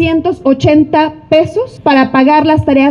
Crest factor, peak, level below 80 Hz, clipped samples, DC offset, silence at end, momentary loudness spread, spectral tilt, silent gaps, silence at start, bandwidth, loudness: 10 dB; 0 dBFS; -38 dBFS; under 0.1%; under 0.1%; 0 s; 5 LU; -7.5 dB/octave; none; 0 s; 7 kHz; -10 LUFS